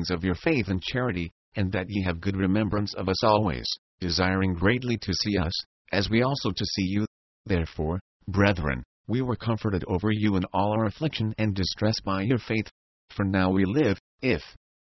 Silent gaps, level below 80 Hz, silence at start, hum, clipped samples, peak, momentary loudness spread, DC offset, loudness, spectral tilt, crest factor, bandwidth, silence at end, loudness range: 1.31-1.52 s, 3.78-3.98 s, 5.66-5.85 s, 7.07-7.44 s, 8.01-8.20 s, 8.85-9.04 s, 12.71-13.08 s, 14.00-14.18 s; -42 dBFS; 0 s; none; under 0.1%; -6 dBFS; 7 LU; under 0.1%; -27 LUFS; -6.5 dB/octave; 20 dB; 6.2 kHz; 0.3 s; 2 LU